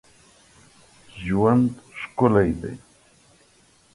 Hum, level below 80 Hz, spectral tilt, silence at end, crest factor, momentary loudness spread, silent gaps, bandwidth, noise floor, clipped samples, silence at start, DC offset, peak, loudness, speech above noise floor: none; -48 dBFS; -8.5 dB/octave; 1.15 s; 20 dB; 17 LU; none; 11.5 kHz; -58 dBFS; under 0.1%; 1.15 s; under 0.1%; -4 dBFS; -21 LUFS; 38 dB